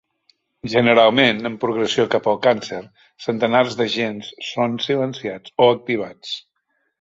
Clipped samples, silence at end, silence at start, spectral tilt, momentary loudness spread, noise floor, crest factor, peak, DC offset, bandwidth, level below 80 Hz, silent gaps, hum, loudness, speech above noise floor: under 0.1%; 0.6 s; 0.65 s; -5 dB/octave; 16 LU; -70 dBFS; 18 dB; -2 dBFS; under 0.1%; 7.8 kHz; -62 dBFS; none; none; -19 LUFS; 51 dB